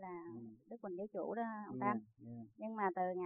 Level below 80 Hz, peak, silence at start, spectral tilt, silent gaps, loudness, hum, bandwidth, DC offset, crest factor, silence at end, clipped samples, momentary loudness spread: -86 dBFS; -22 dBFS; 0 s; -2.5 dB/octave; none; -43 LUFS; none; 3.6 kHz; under 0.1%; 20 dB; 0 s; under 0.1%; 15 LU